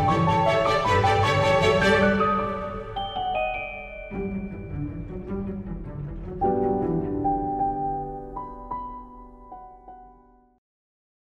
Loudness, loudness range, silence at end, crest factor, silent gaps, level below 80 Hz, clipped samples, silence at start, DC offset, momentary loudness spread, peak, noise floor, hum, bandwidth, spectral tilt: -25 LUFS; 11 LU; 1.25 s; 18 dB; none; -42 dBFS; under 0.1%; 0 s; under 0.1%; 17 LU; -8 dBFS; -55 dBFS; none; 13.5 kHz; -6 dB/octave